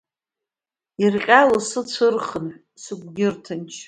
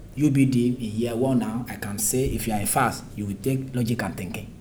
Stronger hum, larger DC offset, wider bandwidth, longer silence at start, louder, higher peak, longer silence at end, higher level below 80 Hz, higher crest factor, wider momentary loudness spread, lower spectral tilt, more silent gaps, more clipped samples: neither; neither; second, 10.5 kHz vs over 20 kHz; first, 1 s vs 0 s; first, -19 LUFS vs -25 LUFS; first, 0 dBFS vs -8 dBFS; about the same, 0.05 s vs 0 s; second, -62 dBFS vs -44 dBFS; about the same, 22 dB vs 18 dB; first, 20 LU vs 11 LU; about the same, -4.5 dB/octave vs -5.5 dB/octave; neither; neither